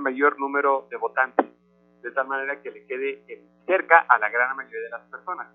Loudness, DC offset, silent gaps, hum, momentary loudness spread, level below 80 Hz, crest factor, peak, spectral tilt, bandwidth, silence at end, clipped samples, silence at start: -23 LUFS; under 0.1%; none; 60 Hz at -65 dBFS; 18 LU; -80 dBFS; 24 dB; 0 dBFS; -7.5 dB/octave; 3.8 kHz; 0.1 s; under 0.1%; 0 s